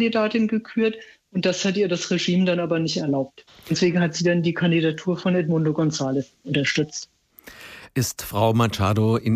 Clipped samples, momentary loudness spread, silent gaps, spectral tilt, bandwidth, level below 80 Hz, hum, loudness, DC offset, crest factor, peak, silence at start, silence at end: under 0.1%; 9 LU; none; -5.5 dB/octave; 15.5 kHz; -58 dBFS; none; -22 LUFS; under 0.1%; 14 dB; -8 dBFS; 0 s; 0 s